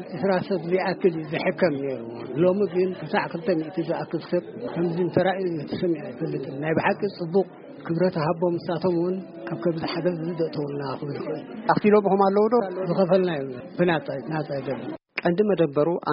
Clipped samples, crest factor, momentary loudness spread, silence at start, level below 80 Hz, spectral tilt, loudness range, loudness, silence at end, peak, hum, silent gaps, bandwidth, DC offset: under 0.1%; 18 dB; 10 LU; 0 s; -64 dBFS; -6 dB/octave; 4 LU; -25 LUFS; 0 s; -6 dBFS; none; none; 5.4 kHz; under 0.1%